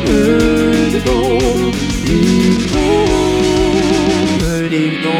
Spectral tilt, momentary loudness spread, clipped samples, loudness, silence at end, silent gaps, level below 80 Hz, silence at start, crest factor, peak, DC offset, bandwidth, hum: -5.5 dB/octave; 4 LU; under 0.1%; -13 LUFS; 0 s; none; -26 dBFS; 0 s; 12 dB; 0 dBFS; under 0.1%; 16.5 kHz; none